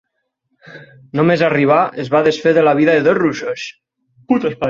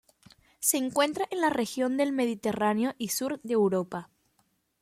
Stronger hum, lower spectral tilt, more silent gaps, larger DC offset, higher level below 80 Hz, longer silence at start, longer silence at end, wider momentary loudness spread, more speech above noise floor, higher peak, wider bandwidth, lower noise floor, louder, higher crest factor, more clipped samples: neither; first, -6.5 dB/octave vs -3.5 dB/octave; neither; neither; first, -56 dBFS vs -70 dBFS; about the same, 0.65 s vs 0.6 s; second, 0 s vs 0.8 s; first, 12 LU vs 5 LU; first, 55 dB vs 44 dB; first, -2 dBFS vs -8 dBFS; second, 7.6 kHz vs 16.5 kHz; about the same, -70 dBFS vs -72 dBFS; first, -14 LUFS vs -28 LUFS; second, 14 dB vs 22 dB; neither